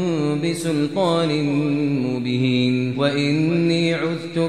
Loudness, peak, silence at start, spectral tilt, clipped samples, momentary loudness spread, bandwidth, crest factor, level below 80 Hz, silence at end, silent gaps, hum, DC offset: -20 LUFS; -6 dBFS; 0 s; -6.5 dB/octave; under 0.1%; 4 LU; 12.5 kHz; 14 dB; -62 dBFS; 0 s; none; none; 0.3%